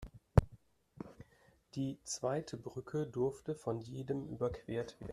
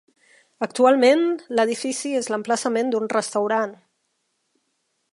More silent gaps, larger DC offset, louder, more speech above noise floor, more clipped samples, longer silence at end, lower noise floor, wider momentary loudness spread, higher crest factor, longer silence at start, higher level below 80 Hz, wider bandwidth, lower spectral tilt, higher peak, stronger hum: neither; neither; second, -39 LUFS vs -21 LUFS; second, 29 dB vs 52 dB; neither; second, 0 s vs 1.4 s; second, -69 dBFS vs -73 dBFS; first, 19 LU vs 9 LU; first, 30 dB vs 18 dB; second, 0 s vs 0.6 s; first, -50 dBFS vs -76 dBFS; first, 13.5 kHz vs 11.5 kHz; first, -6.5 dB/octave vs -3.5 dB/octave; second, -10 dBFS vs -4 dBFS; neither